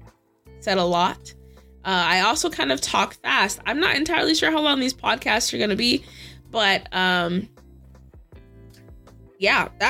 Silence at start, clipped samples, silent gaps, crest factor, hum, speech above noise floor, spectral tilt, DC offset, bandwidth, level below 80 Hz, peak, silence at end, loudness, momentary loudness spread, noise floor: 0 s; under 0.1%; none; 20 dB; none; 29 dB; -3 dB/octave; under 0.1%; 16.5 kHz; -50 dBFS; -4 dBFS; 0 s; -21 LUFS; 10 LU; -51 dBFS